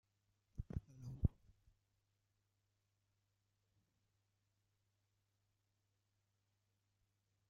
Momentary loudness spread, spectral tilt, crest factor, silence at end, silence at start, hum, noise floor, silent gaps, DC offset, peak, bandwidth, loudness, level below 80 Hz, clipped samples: 13 LU; -11.5 dB/octave; 32 dB; 6.2 s; 0.6 s; none; -86 dBFS; none; under 0.1%; -22 dBFS; 7.2 kHz; -47 LUFS; -60 dBFS; under 0.1%